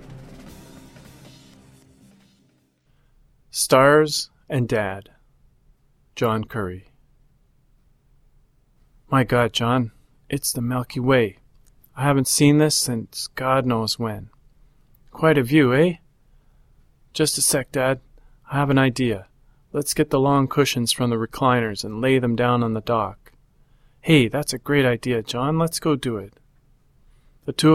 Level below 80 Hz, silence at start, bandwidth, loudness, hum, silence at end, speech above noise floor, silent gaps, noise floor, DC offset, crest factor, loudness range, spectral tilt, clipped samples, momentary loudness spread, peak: -50 dBFS; 0 s; 16.5 kHz; -21 LUFS; none; 0 s; 42 dB; none; -62 dBFS; under 0.1%; 20 dB; 7 LU; -4.5 dB/octave; under 0.1%; 14 LU; -2 dBFS